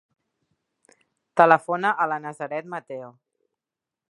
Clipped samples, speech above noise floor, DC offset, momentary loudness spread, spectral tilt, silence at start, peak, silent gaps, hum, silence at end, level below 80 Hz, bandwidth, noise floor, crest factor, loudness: under 0.1%; 66 dB; under 0.1%; 18 LU; -6 dB/octave; 1.35 s; 0 dBFS; none; none; 1 s; -80 dBFS; 11 kHz; -88 dBFS; 26 dB; -22 LUFS